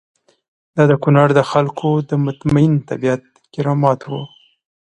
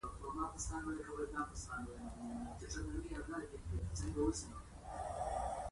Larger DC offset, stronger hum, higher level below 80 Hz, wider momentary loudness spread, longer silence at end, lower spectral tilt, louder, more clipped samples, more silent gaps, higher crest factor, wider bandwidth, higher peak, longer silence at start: neither; neither; about the same, -50 dBFS vs -50 dBFS; first, 14 LU vs 8 LU; first, 0.6 s vs 0 s; first, -8 dB/octave vs -5 dB/octave; first, -16 LUFS vs -44 LUFS; neither; neither; about the same, 16 dB vs 18 dB; second, 9 kHz vs 11.5 kHz; first, 0 dBFS vs -26 dBFS; first, 0.75 s vs 0.05 s